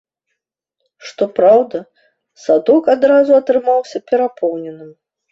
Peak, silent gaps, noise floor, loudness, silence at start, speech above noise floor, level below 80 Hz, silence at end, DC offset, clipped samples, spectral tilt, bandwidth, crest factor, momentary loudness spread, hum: 0 dBFS; none; -76 dBFS; -14 LUFS; 1.05 s; 62 dB; -62 dBFS; 0.4 s; under 0.1%; under 0.1%; -6 dB/octave; 7.6 kHz; 14 dB; 17 LU; none